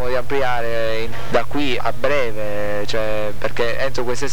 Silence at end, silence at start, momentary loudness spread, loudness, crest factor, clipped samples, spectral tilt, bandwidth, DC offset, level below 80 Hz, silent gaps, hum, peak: 0 s; 0 s; 4 LU; -22 LUFS; 18 dB; under 0.1%; -4.5 dB/octave; 19.5 kHz; 20%; -36 dBFS; none; none; -4 dBFS